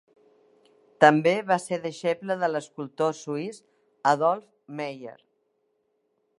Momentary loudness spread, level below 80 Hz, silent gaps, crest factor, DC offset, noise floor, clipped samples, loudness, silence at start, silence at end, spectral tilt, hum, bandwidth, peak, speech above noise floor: 18 LU; -80 dBFS; none; 26 dB; under 0.1%; -73 dBFS; under 0.1%; -25 LUFS; 1 s; 1.3 s; -5.5 dB/octave; none; 11.5 kHz; -2 dBFS; 48 dB